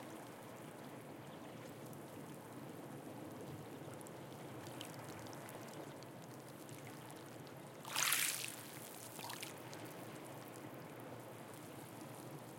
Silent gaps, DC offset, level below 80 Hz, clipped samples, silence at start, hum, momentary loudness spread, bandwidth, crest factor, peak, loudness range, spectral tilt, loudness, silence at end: none; under 0.1%; -88 dBFS; under 0.1%; 0 s; none; 10 LU; 17 kHz; 32 dB; -16 dBFS; 10 LU; -2.5 dB/octave; -47 LUFS; 0 s